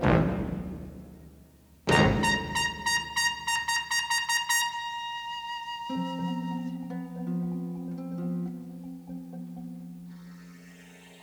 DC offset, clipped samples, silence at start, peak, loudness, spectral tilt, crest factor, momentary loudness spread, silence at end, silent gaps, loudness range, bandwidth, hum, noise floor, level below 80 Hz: under 0.1%; under 0.1%; 0 s; -6 dBFS; -29 LUFS; -4 dB/octave; 24 dB; 21 LU; 0 s; none; 11 LU; over 20 kHz; none; -55 dBFS; -48 dBFS